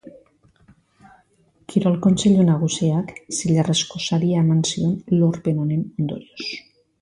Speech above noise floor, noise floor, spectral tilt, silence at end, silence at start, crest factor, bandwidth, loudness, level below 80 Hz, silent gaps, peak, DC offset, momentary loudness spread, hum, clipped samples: 40 dB; -59 dBFS; -6 dB/octave; 0.4 s; 0.05 s; 16 dB; 11.5 kHz; -20 LUFS; -56 dBFS; none; -4 dBFS; under 0.1%; 11 LU; none; under 0.1%